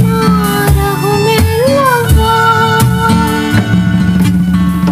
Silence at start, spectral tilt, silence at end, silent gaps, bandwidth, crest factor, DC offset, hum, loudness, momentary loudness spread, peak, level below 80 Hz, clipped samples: 0 s; -6 dB/octave; 0 s; none; 16 kHz; 8 dB; under 0.1%; none; -10 LUFS; 3 LU; 0 dBFS; -20 dBFS; under 0.1%